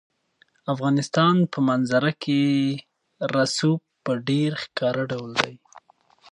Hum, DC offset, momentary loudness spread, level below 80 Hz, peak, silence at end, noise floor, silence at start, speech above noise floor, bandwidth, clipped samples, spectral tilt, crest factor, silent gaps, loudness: none; under 0.1%; 9 LU; -66 dBFS; -2 dBFS; 0.75 s; -63 dBFS; 0.65 s; 41 dB; 11 kHz; under 0.1%; -5.5 dB/octave; 22 dB; none; -23 LUFS